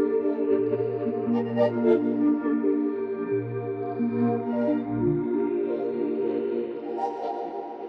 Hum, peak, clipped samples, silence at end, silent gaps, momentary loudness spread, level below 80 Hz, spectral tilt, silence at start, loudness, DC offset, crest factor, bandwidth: none; -10 dBFS; under 0.1%; 0 s; none; 8 LU; -62 dBFS; -10 dB/octave; 0 s; -26 LUFS; under 0.1%; 16 dB; 5.6 kHz